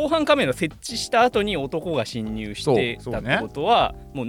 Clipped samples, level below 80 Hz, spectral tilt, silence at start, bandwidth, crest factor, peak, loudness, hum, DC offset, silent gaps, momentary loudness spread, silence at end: under 0.1%; -44 dBFS; -4.5 dB/octave; 0 s; 18 kHz; 16 dB; -6 dBFS; -22 LUFS; none; under 0.1%; none; 9 LU; 0 s